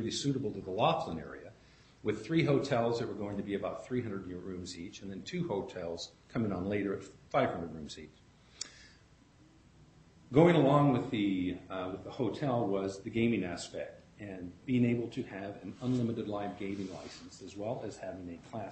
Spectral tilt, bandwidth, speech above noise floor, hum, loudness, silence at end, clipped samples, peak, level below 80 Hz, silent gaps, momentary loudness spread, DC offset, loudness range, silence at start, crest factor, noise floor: -6.5 dB/octave; 8.4 kHz; 28 dB; none; -34 LUFS; 0 s; under 0.1%; -10 dBFS; -64 dBFS; none; 15 LU; under 0.1%; 8 LU; 0 s; 24 dB; -62 dBFS